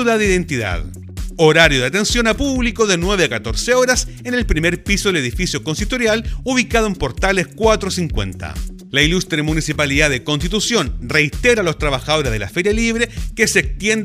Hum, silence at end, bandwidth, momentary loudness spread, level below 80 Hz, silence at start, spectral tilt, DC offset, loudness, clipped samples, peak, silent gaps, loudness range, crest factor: none; 0 s; 16 kHz; 7 LU; -28 dBFS; 0 s; -4 dB/octave; under 0.1%; -16 LUFS; under 0.1%; 0 dBFS; none; 3 LU; 16 dB